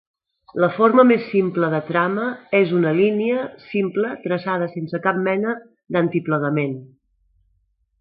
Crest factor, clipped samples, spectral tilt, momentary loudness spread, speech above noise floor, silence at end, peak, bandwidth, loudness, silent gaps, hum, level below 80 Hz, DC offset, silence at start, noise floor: 20 dB; under 0.1%; -12 dB/octave; 10 LU; 47 dB; 1.15 s; 0 dBFS; 5.2 kHz; -20 LUFS; none; none; -68 dBFS; under 0.1%; 0.55 s; -66 dBFS